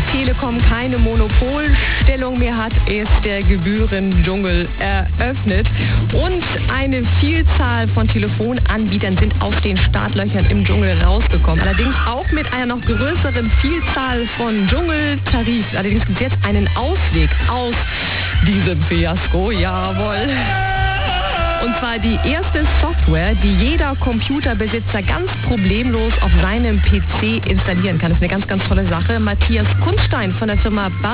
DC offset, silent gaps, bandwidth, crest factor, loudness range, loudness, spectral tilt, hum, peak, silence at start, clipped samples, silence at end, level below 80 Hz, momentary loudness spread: 1%; none; 4 kHz; 16 dB; 1 LU; -17 LUFS; -10.5 dB/octave; none; 0 dBFS; 0 s; under 0.1%; 0 s; -18 dBFS; 3 LU